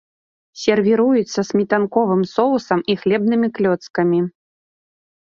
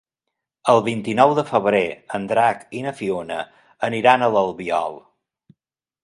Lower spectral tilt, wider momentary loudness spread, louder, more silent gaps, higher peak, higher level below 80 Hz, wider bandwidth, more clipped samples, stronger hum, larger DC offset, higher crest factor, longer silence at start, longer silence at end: about the same, -6.5 dB/octave vs -5.5 dB/octave; second, 4 LU vs 13 LU; about the same, -18 LUFS vs -20 LUFS; first, 3.90-3.94 s vs none; about the same, -2 dBFS vs 0 dBFS; about the same, -60 dBFS vs -62 dBFS; second, 7.4 kHz vs 11.5 kHz; neither; neither; neither; about the same, 16 dB vs 20 dB; about the same, 0.55 s vs 0.65 s; second, 0.9 s vs 1.05 s